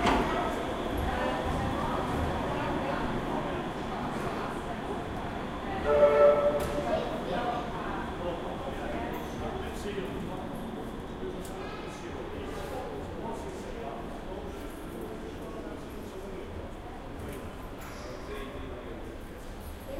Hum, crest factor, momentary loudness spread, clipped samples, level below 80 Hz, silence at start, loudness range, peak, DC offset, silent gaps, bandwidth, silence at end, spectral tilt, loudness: none; 22 dB; 13 LU; under 0.1%; -44 dBFS; 0 s; 13 LU; -10 dBFS; under 0.1%; none; 16 kHz; 0 s; -6 dB/octave; -33 LUFS